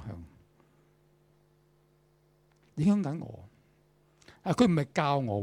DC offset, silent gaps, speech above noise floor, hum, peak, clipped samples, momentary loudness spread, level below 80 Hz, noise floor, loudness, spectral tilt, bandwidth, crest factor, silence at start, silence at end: under 0.1%; none; 39 dB; none; -10 dBFS; under 0.1%; 20 LU; -62 dBFS; -66 dBFS; -29 LUFS; -7 dB/octave; 11.5 kHz; 22 dB; 0 s; 0 s